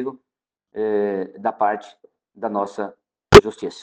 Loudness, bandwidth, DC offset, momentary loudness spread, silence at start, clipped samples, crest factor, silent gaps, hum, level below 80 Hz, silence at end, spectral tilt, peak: -17 LUFS; 10 kHz; under 0.1%; 20 LU; 0 s; 0.4%; 20 dB; none; none; -40 dBFS; 0.1 s; -5.5 dB/octave; 0 dBFS